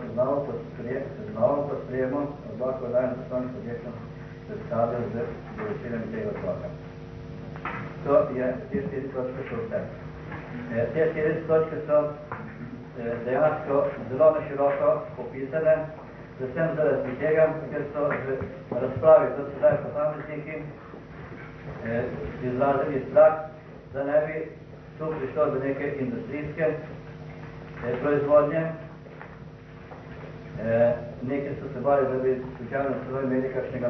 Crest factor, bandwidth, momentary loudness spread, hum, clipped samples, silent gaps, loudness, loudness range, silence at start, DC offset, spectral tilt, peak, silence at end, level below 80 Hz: 20 dB; 6 kHz; 18 LU; none; under 0.1%; none; -27 LUFS; 6 LU; 0 s; under 0.1%; -9.5 dB/octave; -6 dBFS; 0 s; -52 dBFS